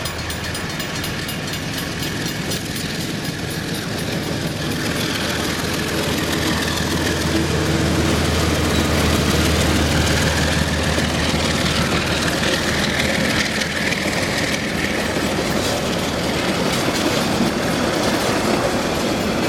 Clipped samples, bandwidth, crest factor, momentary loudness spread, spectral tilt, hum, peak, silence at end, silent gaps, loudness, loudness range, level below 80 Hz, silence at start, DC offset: under 0.1%; 18 kHz; 16 dB; 7 LU; -4 dB/octave; none; -4 dBFS; 0 s; none; -19 LUFS; 6 LU; -32 dBFS; 0 s; under 0.1%